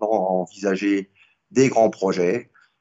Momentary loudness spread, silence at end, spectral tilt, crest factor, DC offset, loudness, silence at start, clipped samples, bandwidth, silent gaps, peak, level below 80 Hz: 8 LU; 0.35 s; -6 dB/octave; 16 dB; under 0.1%; -21 LUFS; 0 s; under 0.1%; 8 kHz; none; -4 dBFS; -70 dBFS